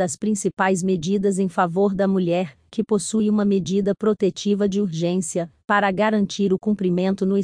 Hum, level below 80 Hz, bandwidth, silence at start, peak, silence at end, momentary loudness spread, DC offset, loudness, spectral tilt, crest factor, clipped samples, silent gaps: none; -58 dBFS; 10.5 kHz; 0 s; -4 dBFS; 0 s; 4 LU; under 0.1%; -21 LUFS; -6 dB/octave; 16 dB; under 0.1%; none